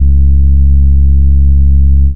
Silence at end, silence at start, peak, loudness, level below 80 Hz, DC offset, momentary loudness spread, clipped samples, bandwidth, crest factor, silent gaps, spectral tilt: 0 s; 0 s; 0 dBFS; -9 LUFS; -6 dBFS; 30%; 0 LU; under 0.1%; 0.4 kHz; 4 dB; none; -23.5 dB/octave